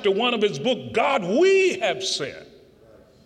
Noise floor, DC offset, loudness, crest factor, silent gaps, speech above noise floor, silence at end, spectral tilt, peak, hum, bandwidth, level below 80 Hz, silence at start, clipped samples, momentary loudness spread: -52 dBFS; under 0.1%; -21 LUFS; 14 dB; none; 30 dB; 0.8 s; -3.5 dB/octave; -8 dBFS; none; 9.8 kHz; -64 dBFS; 0 s; under 0.1%; 8 LU